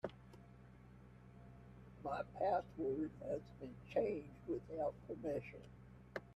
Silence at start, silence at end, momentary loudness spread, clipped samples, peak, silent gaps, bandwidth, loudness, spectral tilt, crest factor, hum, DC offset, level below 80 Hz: 0.05 s; 0 s; 21 LU; under 0.1%; -26 dBFS; none; 12 kHz; -44 LUFS; -8 dB/octave; 20 dB; none; under 0.1%; -66 dBFS